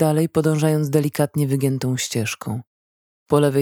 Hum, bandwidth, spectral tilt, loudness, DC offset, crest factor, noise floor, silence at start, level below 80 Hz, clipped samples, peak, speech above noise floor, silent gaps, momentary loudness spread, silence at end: none; 18 kHz; -6 dB/octave; -21 LUFS; under 0.1%; 16 dB; under -90 dBFS; 0 s; -60 dBFS; under 0.1%; -4 dBFS; over 71 dB; 2.67-3.26 s; 8 LU; 0 s